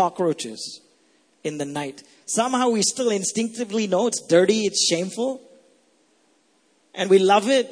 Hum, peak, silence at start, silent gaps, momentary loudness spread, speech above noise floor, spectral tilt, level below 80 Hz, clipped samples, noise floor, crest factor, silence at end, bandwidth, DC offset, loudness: none; -4 dBFS; 0 s; none; 16 LU; 41 dB; -3.5 dB/octave; -72 dBFS; under 0.1%; -63 dBFS; 18 dB; 0 s; 11 kHz; under 0.1%; -21 LUFS